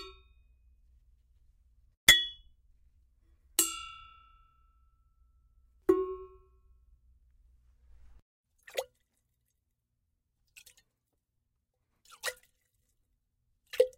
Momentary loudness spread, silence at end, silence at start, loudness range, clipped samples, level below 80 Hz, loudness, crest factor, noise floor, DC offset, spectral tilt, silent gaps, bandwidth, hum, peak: 25 LU; 0.1 s; 0 s; 19 LU; under 0.1%; -60 dBFS; -29 LUFS; 34 dB; -82 dBFS; under 0.1%; -0.5 dB/octave; 1.97-2.07 s, 8.22-8.44 s; 16 kHz; none; -4 dBFS